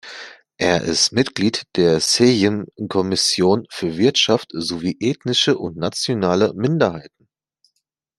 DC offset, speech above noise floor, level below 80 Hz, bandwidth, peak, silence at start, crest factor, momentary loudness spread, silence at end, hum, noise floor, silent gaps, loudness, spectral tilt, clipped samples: under 0.1%; 55 dB; -56 dBFS; 13 kHz; -2 dBFS; 0.05 s; 18 dB; 10 LU; 1.1 s; none; -73 dBFS; none; -18 LUFS; -4 dB/octave; under 0.1%